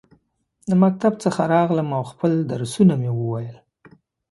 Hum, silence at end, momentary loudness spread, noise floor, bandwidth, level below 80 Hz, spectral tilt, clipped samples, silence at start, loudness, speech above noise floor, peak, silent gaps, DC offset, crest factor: none; 0.75 s; 10 LU; -64 dBFS; 11.5 kHz; -60 dBFS; -7.5 dB/octave; under 0.1%; 0.65 s; -20 LUFS; 45 dB; -4 dBFS; none; under 0.1%; 18 dB